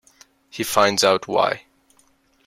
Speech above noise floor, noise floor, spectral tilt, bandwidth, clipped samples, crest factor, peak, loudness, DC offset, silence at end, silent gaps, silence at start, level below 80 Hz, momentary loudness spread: 41 dB; -60 dBFS; -2.5 dB/octave; 16.5 kHz; under 0.1%; 20 dB; -2 dBFS; -19 LUFS; under 0.1%; 0.85 s; none; 0.55 s; -62 dBFS; 15 LU